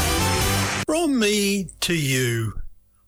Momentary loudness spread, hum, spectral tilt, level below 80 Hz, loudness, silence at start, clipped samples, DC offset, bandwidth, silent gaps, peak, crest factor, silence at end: 6 LU; none; -4 dB/octave; -38 dBFS; -22 LUFS; 0 s; under 0.1%; under 0.1%; over 20 kHz; none; -12 dBFS; 10 dB; 0.35 s